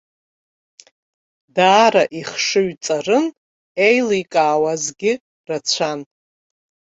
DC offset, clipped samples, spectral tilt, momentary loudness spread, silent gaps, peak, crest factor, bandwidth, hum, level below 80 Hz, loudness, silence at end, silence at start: under 0.1%; under 0.1%; -3 dB/octave; 13 LU; 3.38-3.75 s, 5.21-5.44 s; -2 dBFS; 18 dB; 8.2 kHz; none; -66 dBFS; -17 LUFS; 0.9 s; 1.55 s